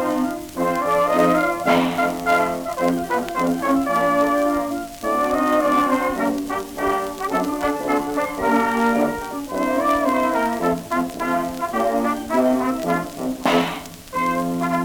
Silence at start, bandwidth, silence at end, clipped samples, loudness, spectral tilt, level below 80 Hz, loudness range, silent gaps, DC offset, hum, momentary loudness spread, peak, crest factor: 0 s; over 20 kHz; 0 s; under 0.1%; -21 LUFS; -5 dB/octave; -48 dBFS; 2 LU; none; under 0.1%; none; 6 LU; -6 dBFS; 16 dB